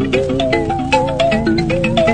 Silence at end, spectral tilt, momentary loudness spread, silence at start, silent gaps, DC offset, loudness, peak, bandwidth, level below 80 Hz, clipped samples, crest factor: 0 s; -6 dB/octave; 2 LU; 0 s; none; under 0.1%; -15 LUFS; 0 dBFS; 9.6 kHz; -32 dBFS; under 0.1%; 14 dB